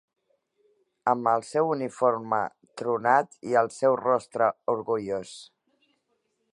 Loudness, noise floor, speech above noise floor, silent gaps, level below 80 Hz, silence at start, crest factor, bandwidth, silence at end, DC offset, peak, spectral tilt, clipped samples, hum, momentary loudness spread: -26 LUFS; -75 dBFS; 49 dB; none; -74 dBFS; 1.05 s; 20 dB; 11 kHz; 1.1 s; under 0.1%; -6 dBFS; -5.5 dB/octave; under 0.1%; none; 10 LU